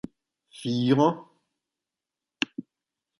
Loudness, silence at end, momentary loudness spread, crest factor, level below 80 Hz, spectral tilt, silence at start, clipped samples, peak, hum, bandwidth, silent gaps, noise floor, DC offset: -26 LUFS; 0.6 s; 20 LU; 24 dB; -70 dBFS; -6.5 dB/octave; 0.55 s; under 0.1%; -6 dBFS; none; 11.5 kHz; none; -89 dBFS; under 0.1%